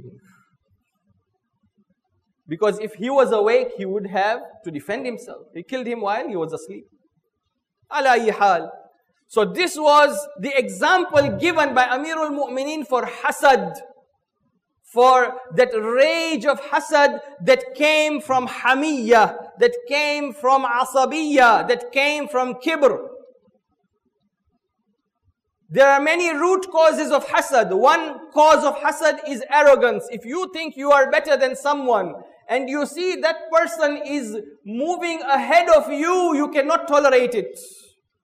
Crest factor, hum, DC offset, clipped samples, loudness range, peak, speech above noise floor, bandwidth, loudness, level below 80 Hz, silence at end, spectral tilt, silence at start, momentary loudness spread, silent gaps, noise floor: 16 dB; none; under 0.1%; under 0.1%; 7 LU; -4 dBFS; 58 dB; 15.5 kHz; -19 LUFS; -62 dBFS; 0.5 s; -3.5 dB/octave; 0.05 s; 13 LU; none; -76 dBFS